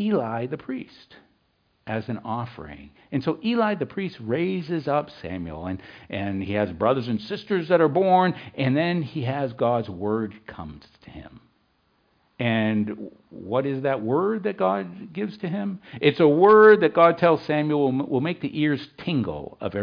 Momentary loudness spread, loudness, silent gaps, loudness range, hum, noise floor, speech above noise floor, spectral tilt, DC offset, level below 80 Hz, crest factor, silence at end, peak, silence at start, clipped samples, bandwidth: 17 LU; -23 LUFS; none; 11 LU; none; -68 dBFS; 45 dB; -9 dB/octave; under 0.1%; -58 dBFS; 18 dB; 0 s; -4 dBFS; 0 s; under 0.1%; 5.2 kHz